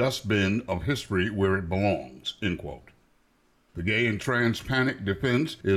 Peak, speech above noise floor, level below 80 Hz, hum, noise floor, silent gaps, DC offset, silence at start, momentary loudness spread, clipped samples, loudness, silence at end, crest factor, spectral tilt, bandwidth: -12 dBFS; 39 dB; -50 dBFS; none; -65 dBFS; none; under 0.1%; 0 s; 9 LU; under 0.1%; -27 LUFS; 0 s; 14 dB; -6 dB/octave; 14.5 kHz